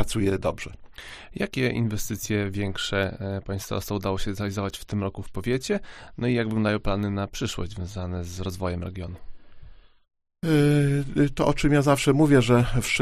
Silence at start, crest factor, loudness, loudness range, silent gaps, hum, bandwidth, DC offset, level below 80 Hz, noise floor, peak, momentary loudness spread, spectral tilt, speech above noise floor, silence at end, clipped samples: 0 s; 20 dB; -25 LUFS; 8 LU; none; none; 15.5 kHz; under 0.1%; -40 dBFS; -45 dBFS; -6 dBFS; 13 LU; -6 dB/octave; 21 dB; 0 s; under 0.1%